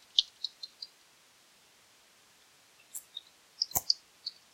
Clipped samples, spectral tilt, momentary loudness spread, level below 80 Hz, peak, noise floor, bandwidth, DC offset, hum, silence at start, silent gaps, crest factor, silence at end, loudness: under 0.1%; 1 dB/octave; 18 LU; -70 dBFS; -6 dBFS; -63 dBFS; 16 kHz; under 0.1%; none; 0.15 s; none; 32 dB; 0.25 s; -34 LUFS